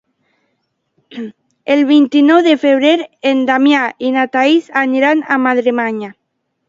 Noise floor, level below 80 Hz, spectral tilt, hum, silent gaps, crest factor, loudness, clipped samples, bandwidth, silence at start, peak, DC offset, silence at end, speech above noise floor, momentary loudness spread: -70 dBFS; -66 dBFS; -4.5 dB/octave; none; none; 14 dB; -12 LUFS; under 0.1%; 7.6 kHz; 1.1 s; 0 dBFS; under 0.1%; 0.55 s; 57 dB; 19 LU